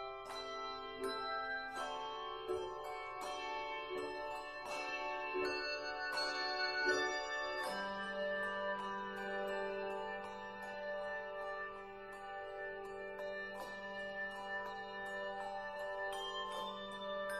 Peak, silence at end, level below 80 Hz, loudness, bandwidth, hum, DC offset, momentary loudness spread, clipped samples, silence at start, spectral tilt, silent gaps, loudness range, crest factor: -22 dBFS; 0 s; -68 dBFS; -42 LUFS; 15 kHz; none; under 0.1%; 8 LU; under 0.1%; 0 s; -2.5 dB/octave; none; 7 LU; 20 dB